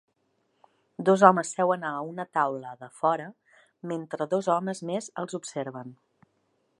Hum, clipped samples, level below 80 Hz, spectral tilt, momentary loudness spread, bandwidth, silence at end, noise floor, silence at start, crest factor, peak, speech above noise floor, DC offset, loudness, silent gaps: none; under 0.1%; -82 dBFS; -5.5 dB/octave; 23 LU; 11.5 kHz; 0.85 s; -73 dBFS; 1 s; 26 dB; -2 dBFS; 46 dB; under 0.1%; -27 LUFS; none